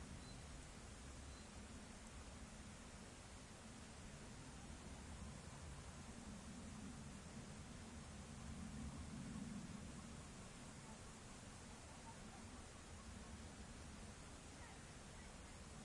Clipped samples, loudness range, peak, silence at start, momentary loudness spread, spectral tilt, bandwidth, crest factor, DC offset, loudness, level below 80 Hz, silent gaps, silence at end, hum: under 0.1%; 3 LU; -40 dBFS; 0 s; 5 LU; -4.5 dB/octave; 11.5 kHz; 16 dB; under 0.1%; -56 LUFS; -62 dBFS; none; 0 s; none